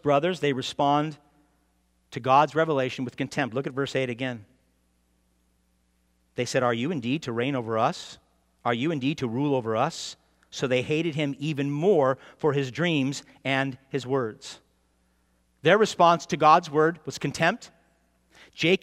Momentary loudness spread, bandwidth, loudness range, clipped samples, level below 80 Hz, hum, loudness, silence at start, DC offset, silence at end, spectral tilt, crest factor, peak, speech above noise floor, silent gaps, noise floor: 12 LU; 14 kHz; 8 LU; under 0.1%; -68 dBFS; none; -25 LUFS; 0.05 s; under 0.1%; 0.05 s; -5.5 dB/octave; 22 dB; -4 dBFS; 43 dB; none; -68 dBFS